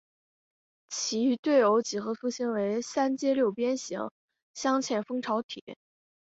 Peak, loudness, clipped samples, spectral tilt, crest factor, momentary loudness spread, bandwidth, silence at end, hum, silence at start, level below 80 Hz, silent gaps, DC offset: -12 dBFS; -29 LUFS; under 0.1%; -3.5 dB/octave; 18 dB; 14 LU; 8 kHz; 0.6 s; none; 0.9 s; -76 dBFS; 1.39-1.43 s, 4.11-4.28 s, 4.42-4.54 s, 5.43-5.49 s, 5.61-5.67 s; under 0.1%